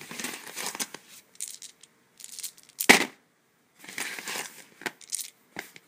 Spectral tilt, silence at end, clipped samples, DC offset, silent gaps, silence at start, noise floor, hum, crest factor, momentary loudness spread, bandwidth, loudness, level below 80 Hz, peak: -1 dB/octave; 0.2 s; under 0.1%; under 0.1%; none; 0 s; -67 dBFS; none; 32 dB; 23 LU; 16 kHz; -28 LUFS; -72 dBFS; 0 dBFS